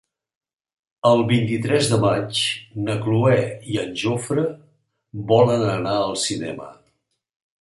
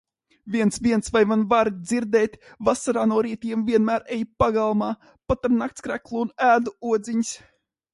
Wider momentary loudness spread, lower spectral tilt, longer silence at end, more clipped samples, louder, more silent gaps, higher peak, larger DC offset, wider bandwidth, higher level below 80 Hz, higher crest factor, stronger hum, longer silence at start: about the same, 10 LU vs 9 LU; about the same, -5.5 dB/octave vs -5.5 dB/octave; first, 0.9 s vs 0.55 s; neither; first, -20 LUFS vs -23 LUFS; neither; about the same, -4 dBFS vs -4 dBFS; neither; about the same, 11.5 kHz vs 11.5 kHz; second, -56 dBFS vs -48 dBFS; about the same, 18 dB vs 18 dB; neither; first, 1.05 s vs 0.45 s